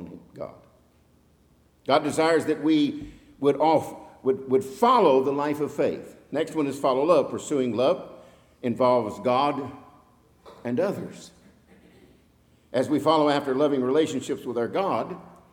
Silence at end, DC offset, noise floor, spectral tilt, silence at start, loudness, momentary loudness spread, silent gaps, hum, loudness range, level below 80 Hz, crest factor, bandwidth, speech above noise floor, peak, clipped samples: 0.25 s; under 0.1%; -60 dBFS; -5.5 dB/octave; 0 s; -24 LUFS; 18 LU; none; none; 6 LU; -64 dBFS; 20 dB; 18 kHz; 37 dB; -6 dBFS; under 0.1%